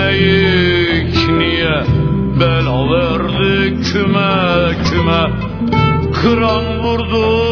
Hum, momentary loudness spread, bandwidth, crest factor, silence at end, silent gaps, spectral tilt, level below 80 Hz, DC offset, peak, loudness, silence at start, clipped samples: none; 4 LU; 5.4 kHz; 12 dB; 0 s; none; -7 dB/octave; -28 dBFS; under 0.1%; 0 dBFS; -13 LUFS; 0 s; under 0.1%